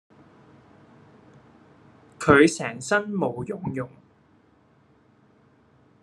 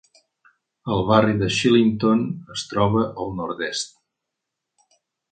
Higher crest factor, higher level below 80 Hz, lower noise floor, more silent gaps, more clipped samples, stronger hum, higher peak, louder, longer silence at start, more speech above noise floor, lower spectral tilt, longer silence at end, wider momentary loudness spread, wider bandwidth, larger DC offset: first, 26 dB vs 20 dB; second, -58 dBFS vs -50 dBFS; second, -60 dBFS vs -82 dBFS; neither; neither; neither; about the same, -2 dBFS vs -2 dBFS; about the same, -23 LUFS vs -21 LUFS; first, 2.2 s vs 0.85 s; second, 38 dB vs 62 dB; about the same, -5 dB/octave vs -5.5 dB/octave; first, 2.15 s vs 1.45 s; first, 15 LU vs 11 LU; first, 12 kHz vs 9.4 kHz; neither